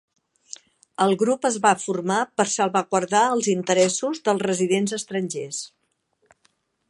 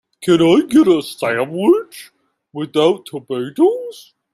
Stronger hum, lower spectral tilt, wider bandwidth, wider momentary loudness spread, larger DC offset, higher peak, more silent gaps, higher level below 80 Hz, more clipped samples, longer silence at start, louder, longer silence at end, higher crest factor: neither; second, -4 dB/octave vs -6 dB/octave; second, 11.5 kHz vs 13.5 kHz; about the same, 17 LU vs 15 LU; neither; about the same, -2 dBFS vs -2 dBFS; neither; second, -72 dBFS vs -58 dBFS; neither; first, 1 s vs 0.2 s; second, -22 LUFS vs -16 LUFS; first, 1.25 s vs 0.35 s; first, 20 dB vs 14 dB